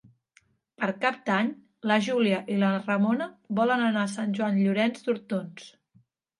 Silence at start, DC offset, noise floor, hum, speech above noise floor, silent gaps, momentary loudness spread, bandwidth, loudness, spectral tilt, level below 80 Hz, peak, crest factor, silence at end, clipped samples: 0.8 s; under 0.1%; -65 dBFS; none; 39 dB; none; 8 LU; 11 kHz; -27 LUFS; -6 dB/octave; -78 dBFS; -8 dBFS; 20 dB; 0.7 s; under 0.1%